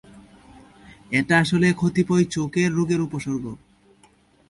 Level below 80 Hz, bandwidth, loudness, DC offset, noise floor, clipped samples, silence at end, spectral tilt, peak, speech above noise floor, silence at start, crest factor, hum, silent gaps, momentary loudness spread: -54 dBFS; 11.5 kHz; -21 LUFS; under 0.1%; -57 dBFS; under 0.1%; 0.95 s; -6 dB/octave; -4 dBFS; 36 dB; 0.15 s; 18 dB; none; none; 11 LU